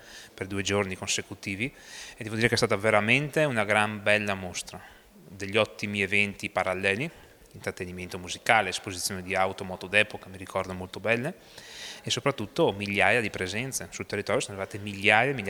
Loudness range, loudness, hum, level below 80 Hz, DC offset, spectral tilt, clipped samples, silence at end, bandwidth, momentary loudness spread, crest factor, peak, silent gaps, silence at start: 3 LU; -27 LUFS; none; -60 dBFS; under 0.1%; -3.5 dB/octave; under 0.1%; 0 s; over 20 kHz; 15 LU; 24 dB; -4 dBFS; none; 0 s